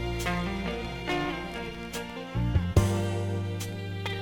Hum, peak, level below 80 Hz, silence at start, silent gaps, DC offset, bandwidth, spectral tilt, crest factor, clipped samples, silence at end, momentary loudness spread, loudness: none; -10 dBFS; -40 dBFS; 0 s; none; under 0.1%; 18.5 kHz; -6 dB/octave; 20 dB; under 0.1%; 0 s; 10 LU; -31 LUFS